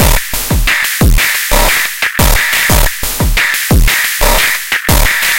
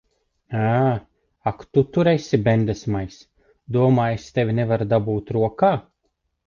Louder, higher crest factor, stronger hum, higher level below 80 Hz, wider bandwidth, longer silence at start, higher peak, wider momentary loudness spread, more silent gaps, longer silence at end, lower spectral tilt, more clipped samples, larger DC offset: first, -10 LUFS vs -21 LUFS; second, 10 dB vs 18 dB; neither; first, -14 dBFS vs -48 dBFS; first, 17.5 kHz vs 7.2 kHz; second, 0 s vs 0.5 s; first, 0 dBFS vs -4 dBFS; second, 4 LU vs 10 LU; neither; second, 0 s vs 0.65 s; second, -2.5 dB/octave vs -8 dB/octave; neither; neither